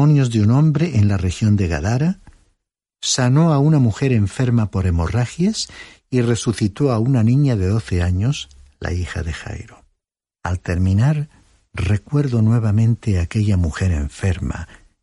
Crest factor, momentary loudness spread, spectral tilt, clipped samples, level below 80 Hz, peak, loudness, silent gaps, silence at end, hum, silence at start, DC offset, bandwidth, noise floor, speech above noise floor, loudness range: 12 dB; 13 LU; -6.5 dB/octave; under 0.1%; -34 dBFS; -4 dBFS; -18 LUFS; none; 0.4 s; none; 0 s; under 0.1%; 11.5 kHz; -80 dBFS; 63 dB; 5 LU